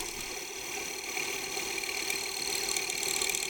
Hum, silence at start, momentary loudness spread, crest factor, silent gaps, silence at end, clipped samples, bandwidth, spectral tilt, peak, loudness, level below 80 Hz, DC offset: none; 0 s; 7 LU; 22 dB; none; 0 s; under 0.1%; over 20 kHz; 0.5 dB/octave; -12 dBFS; -32 LUFS; -60 dBFS; under 0.1%